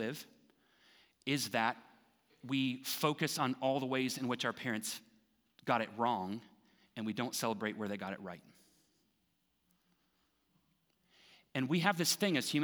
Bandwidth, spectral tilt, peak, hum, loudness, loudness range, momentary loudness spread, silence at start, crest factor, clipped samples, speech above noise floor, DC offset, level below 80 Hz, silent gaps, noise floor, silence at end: over 20 kHz; -4 dB/octave; -14 dBFS; none; -36 LUFS; 9 LU; 15 LU; 0 s; 24 dB; under 0.1%; 43 dB; under 0.1%; -88 dBFS; none; -79 dBFS; 0 s